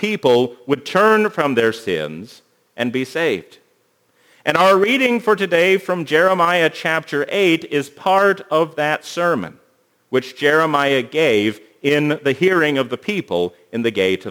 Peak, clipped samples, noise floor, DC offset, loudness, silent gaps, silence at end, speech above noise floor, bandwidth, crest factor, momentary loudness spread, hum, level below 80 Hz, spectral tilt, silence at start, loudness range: 0 dBFS; under 0.1%; -61 dBFS; under 0.1%; -17 LUFS; none; 0 s; 44 dB; over 20 kHz; 18 dB; 9 LU; none; -66 dBFS; -5 dB/octave; 0 s; 3 LU